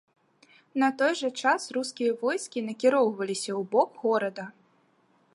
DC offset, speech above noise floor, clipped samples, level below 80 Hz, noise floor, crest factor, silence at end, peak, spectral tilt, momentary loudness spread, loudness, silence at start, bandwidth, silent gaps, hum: under 0.1%; 39 dB; under 0.1%; -84 dBFS; -66 dBFS; 18 dB; 0.85 s; -10 dBFS; -3.5 dB/octave; 9 LU; -27 LUFS; 0.75 s; 11.5 kHz; none; none